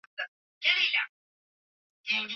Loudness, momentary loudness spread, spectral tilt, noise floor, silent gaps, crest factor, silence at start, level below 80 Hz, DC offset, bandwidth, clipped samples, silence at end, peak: -27 LUFS; 16 LU; -0.5 dB/octave; under -90 dBFS; 0.28-0.61 s, 1.09-2.04 s; 22 dB; 0.2 s; under -90 dBFS; under 0.1%; 7.4 kHz; under 0.1%; 0 s; -10 dBFS